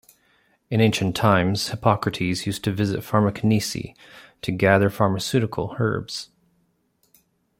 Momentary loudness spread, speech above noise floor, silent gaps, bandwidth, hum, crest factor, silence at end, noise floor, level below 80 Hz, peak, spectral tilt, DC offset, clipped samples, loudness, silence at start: 12 LU; 46 dB; none; 16.5 kHz; none; 22 dB; 1.35 s; -67 dBFS; -54 dBFS; -2 dBFS; -5.5 dB/octave; under 0.1%; under 0.1%; -22 LUFS; 0.7 s